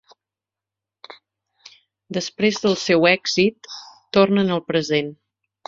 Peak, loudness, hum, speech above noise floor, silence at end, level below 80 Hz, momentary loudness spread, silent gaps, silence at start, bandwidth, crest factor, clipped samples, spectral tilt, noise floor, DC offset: 0 dBFS; -19 LUFS; none; 69 dB; 0.55 s; -62 dBFS; 16 LU; none; 1.1 s; 7.8 kHz; 22 dB; under 0.1%; -4.5 dB/octave; -88 dBFS; under 0.1%